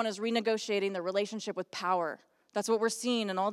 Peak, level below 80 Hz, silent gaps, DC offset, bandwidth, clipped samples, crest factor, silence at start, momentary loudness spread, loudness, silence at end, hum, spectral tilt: -16 dBFS; under -90 dBFS; none; under 0.1%; 14.5 kHz; under 0.1%; 16 dB; 0 s; 8 LU; -32 LUFS; 0 s; none; -3.5 dB/octave